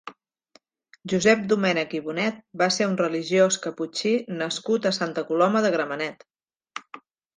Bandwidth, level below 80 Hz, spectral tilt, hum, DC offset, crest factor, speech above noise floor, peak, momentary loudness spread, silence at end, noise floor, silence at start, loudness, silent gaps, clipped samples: 10 kHz; -68 dBFS; -4 dB/octave; none; under 0.1%; 20 dB; 37 dB; -6 dBFS; 13 LU; 0.4 s; -61 dBFS; 0.05 s; -24 LUFS; 6.56-6.60 s; under 0.1%